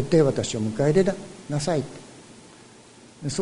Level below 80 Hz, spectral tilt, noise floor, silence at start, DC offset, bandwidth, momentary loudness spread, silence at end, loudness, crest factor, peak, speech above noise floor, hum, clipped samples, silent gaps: -52 dBFS; -6 dB/octave; -49 dBFS; 0 s; under 0.1%; 11 kHz; 17 LU; 0 s; -24 LUFS; 18 dB; -6 dBFS; 27 dB; none; under 0.1%; none